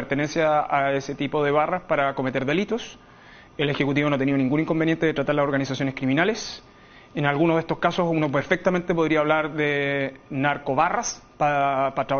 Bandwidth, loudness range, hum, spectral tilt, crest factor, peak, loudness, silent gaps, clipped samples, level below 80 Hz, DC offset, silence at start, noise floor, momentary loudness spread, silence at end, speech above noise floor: 6.8 kHz; 2 LU; none; -4.5 dB/octave; 18 dB; -6 dBFS; -23 LUFS; none; under 0.1%; -54 dBFS; under 0.1%; 0 s; -48 dBFS; 6 LU; 0 s; 25 dB